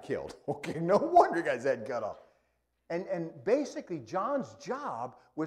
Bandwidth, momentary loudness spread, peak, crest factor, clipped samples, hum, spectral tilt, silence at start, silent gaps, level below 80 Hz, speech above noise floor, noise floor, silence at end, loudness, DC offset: 11.5 kHz; 15 LU; -10 dBFS; 22 dB; under 0.1%; none; -6.5 dB/octave; 0 s; none; -68 dBFS; 45 dB; -76 dBFS; 0 s; -31 LUFS; under 0.1%